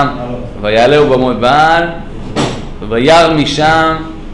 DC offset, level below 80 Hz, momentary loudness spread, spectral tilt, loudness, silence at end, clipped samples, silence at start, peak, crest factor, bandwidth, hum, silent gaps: under 0.1%; -28 dBFS; 14 LU; -5 dB/octave; -10 LUFS; 0 s; under 0.1%; 0 s; 0 dBFS; 10 dB; 11 kHz; none; none